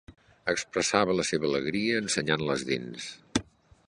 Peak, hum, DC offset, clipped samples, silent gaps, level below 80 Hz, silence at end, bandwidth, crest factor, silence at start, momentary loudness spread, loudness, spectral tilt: -6 dBFS; none; under 0.1%; under 0.1%; none; -58 dBFS; 0.45 s; 11.5 kHz; 24 dB; 0.1 s; 8 LU; -28 LUFS; -3.5 dB/octave